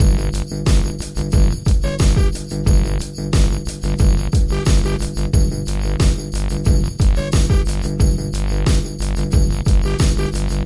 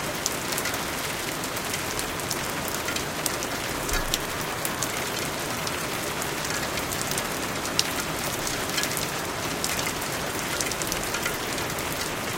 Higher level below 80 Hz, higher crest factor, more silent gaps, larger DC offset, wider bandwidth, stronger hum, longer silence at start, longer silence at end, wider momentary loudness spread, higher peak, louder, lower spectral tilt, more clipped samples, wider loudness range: first, -18 dBFS vs -44 dBFS; second, 12 dB vs 28 dB; neither; neither; second, 11.5 kHz vs 17 kHz; neither; about the same, 0 s vs 0 s; about the same, 0 s vs 0 s; first, 6 LU vs 3 LU; second, -4 dBFS vs 0 dBFS; first, -18 LUFS vs -27 LUFS; first, -6 dB/octave vs -2 dB/octave; neither; about the same, 1 LU vs 1 LU